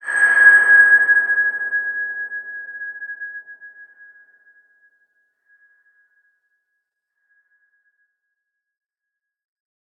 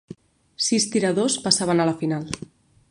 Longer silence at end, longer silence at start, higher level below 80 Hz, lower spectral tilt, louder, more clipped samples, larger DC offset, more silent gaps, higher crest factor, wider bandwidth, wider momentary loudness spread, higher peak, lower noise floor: first, 6.15 s vs 0.55 s; about the same, 0.05 s vs 0.1 s; second, -88 dBFS vs -58 dBFS; second, 0 dB/octave vs -3.5 dB/octave; first, -13 LUFS vs -21 LUFS; neither; neither; neither; about the same, 20 dB vs 22 dB; second, 8.8 kHz vs 11.5 kHz; first, 22 LU vs 10 LU; about the same, -2 dBFS vs -2 dBFS; first, -84 dBFS vs -45 dBFS